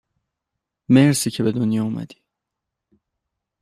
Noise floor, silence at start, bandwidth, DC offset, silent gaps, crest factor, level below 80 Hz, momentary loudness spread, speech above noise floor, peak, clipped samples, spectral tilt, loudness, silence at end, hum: -83 dBFS; 0.9 s; 15 kHz; under 0.1%; none; 20 dB; -60 dBFS; 15 LU; 65 dB; -2 dBFS; under 0.1%; -5.5 dB/octave; -19 LUFS; 1.55 s; none